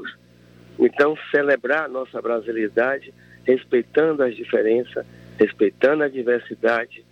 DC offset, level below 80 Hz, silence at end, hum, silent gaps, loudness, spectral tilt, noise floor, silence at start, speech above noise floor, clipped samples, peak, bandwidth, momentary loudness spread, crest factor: under 0.1%; -64 dBFS; 0.15 s; 60 Hz at -55 dBFS; none; -21 LUFS; -7 dB/octave; -50 dBFS; 0 s; 29 dB; under 0.1%; -4 dBFS; 6.6 kHz; 9 LU; 18 dB